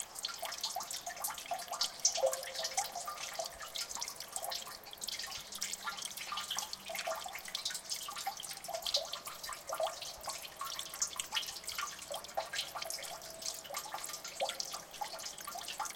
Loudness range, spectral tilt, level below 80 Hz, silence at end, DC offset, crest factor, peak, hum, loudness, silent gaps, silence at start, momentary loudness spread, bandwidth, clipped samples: 4 LU; 1 dB/octave; -72 dBFS; 0 s; under 0.1%; 24 dB; -16 dBFS; none; -39 LUFS; none; 0 s; 7 LU; 17 kHz; under 0.1%